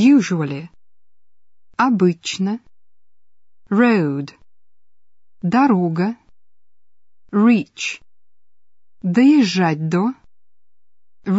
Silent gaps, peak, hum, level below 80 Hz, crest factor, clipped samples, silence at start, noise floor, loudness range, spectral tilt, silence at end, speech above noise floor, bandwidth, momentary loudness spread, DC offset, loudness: none; -4 dBFS; none; -64 dBFS; 16 dB; under 0.1%; 0 s; under -90 dBFS; 4 LU; -6.5 dB/octave; 0 s; over 74 dB; 8 kHz; 16 LU; under 0.1%; -18 LUFS